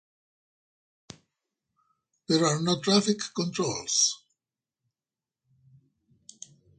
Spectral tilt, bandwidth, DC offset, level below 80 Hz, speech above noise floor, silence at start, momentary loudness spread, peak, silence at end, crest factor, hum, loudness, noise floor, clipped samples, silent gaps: -3.5 dB/octave; 10.5 kHz; under 0.1%; -72 dBFS; over 64 dB; 2.3 s; 15 LU; -10 dBFS; 2.65 s; 22 dB; none; -25 LUFS; under -90 dBFS; under 0.1%; none